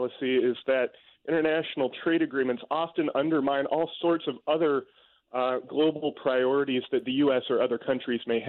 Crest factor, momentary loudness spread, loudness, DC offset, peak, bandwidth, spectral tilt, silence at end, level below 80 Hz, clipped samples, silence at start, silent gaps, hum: 14 dB; 5 LU; -27 LUFS; under 0.1%; -14 dBFS; 4.3 kHz; -3.5 dB/octave; 0 s; -72 dBFS; under 0.1%; 0 s; none; none